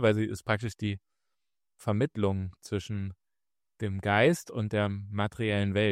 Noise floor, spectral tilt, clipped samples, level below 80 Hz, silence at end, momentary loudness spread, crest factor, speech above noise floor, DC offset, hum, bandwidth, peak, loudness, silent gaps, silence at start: under -90 dBFS; -6.5 dB/octave; under 0.1%; -62 dBFS; 0 s; 12 LU; 20 dB; over 61 dB; under 0.1%; none; 14 kHz; -10 dBFS; -30 LUFS; none; 0 s